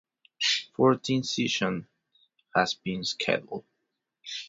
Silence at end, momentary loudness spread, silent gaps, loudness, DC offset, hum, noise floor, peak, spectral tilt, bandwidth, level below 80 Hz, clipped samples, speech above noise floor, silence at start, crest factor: 0 s; 14 LU; none; -27 LUFS; under 0.1%; none; -81 dBFS; -8 dBFS; -4 dB/octave; 7.8 kHz; -66 dBFS; under 0.1%; 54 dB; 0.4 s; 22 dB